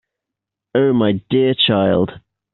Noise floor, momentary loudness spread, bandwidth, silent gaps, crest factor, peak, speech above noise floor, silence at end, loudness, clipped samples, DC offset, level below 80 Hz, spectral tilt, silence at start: -83 dBFS; 6 LU; 4.3 kHz; none; 14 dB; -4 dBFS; 68 dB; 0.35 s; -16 LUFS; under 0.1%; under 0.1%; -54 dBFS; -4.5 dB/octave; 0.75 s